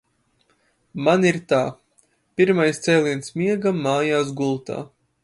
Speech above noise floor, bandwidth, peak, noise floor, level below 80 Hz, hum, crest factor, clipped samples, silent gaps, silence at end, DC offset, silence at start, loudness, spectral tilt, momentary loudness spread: 45 dB; 11.5 kHz; -4 dBFS; -65 dBFS; -64 dBFS; none; 18 dB; under 0.1%; none; 0.35 s; under 0.1%; 0.95 s; -21 LUFS; -5.5 dB/octave; 15 LU